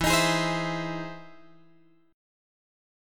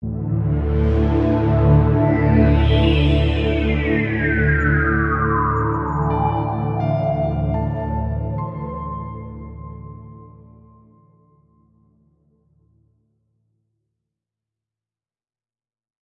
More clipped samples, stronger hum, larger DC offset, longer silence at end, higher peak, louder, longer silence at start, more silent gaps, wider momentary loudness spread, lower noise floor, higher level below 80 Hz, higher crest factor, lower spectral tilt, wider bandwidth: neither; neither; neither; second, 0.95 s vs 5.75 s; second, -10 dBFS vs -4 dBFS; second, -27 LUFS vs -19 LUFS; about the same, 0 s vs 0 s; neither; first, 18 LU vs 15 LU; second, -61 dBFS vs under -90 dBFS; second, -48 dBFS vs -28 dBFS; about the same, 20 dB vs 16 dB; second, -3.5 dB/octave vs -9.5 dB/octave; first, 17.5 kHz vs 5.4 kHz